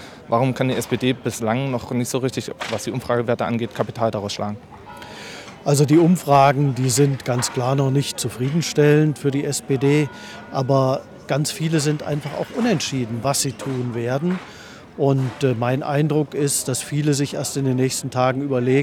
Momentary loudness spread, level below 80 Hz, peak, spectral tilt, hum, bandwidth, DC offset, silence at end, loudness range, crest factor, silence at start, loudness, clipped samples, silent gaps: 11 LU; -56 dBFS; -4 dBFS; -5.5 dB/octave; none; 17 kHz; under 0.1%; 0 s; 5 LU; 16 dB; 0 s; -21 LUFS; under 0.1%; none